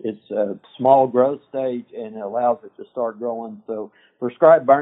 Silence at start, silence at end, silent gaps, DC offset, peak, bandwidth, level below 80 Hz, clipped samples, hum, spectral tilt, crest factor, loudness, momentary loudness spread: 0.05 s; 0 s; none; under 0.1%; 0 dBFS; 3.9 kHz; -74 dBFS; under 0.1%; none; -9 dB/octave; 20 dB; -20 LUFS; 17 LU